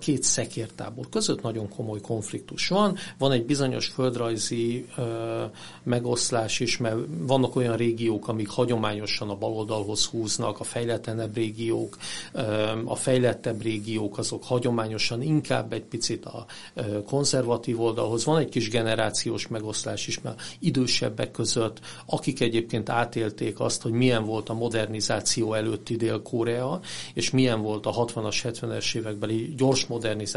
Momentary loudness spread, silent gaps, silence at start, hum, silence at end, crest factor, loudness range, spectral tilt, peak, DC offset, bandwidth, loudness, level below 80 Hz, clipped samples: 8 LU; none; 0 s; none; 0 s; 20 dB; 2 LU; -4.5 dB/octave; -6 dBFS; 0.4%; 11.5 kHz; -27 LUFS; -56 dBFS; under 0.1%